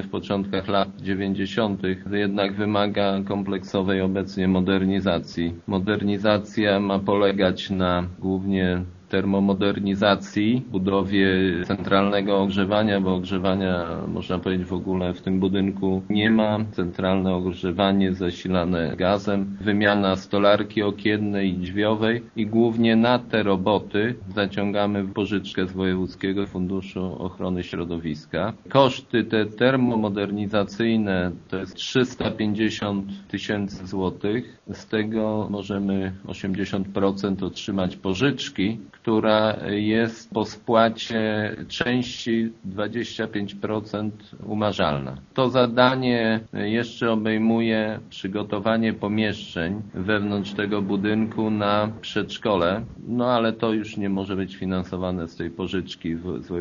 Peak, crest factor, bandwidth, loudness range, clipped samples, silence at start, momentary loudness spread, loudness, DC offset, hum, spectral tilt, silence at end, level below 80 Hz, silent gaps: 0 dBFS; 22 dB; 7.2 kHz; 5 LU; under 0.1%; 0 s; 9 LU; -24 LUFS; under 0.1%; none; -5 dB/octave; 0 s; -54 dBFS; none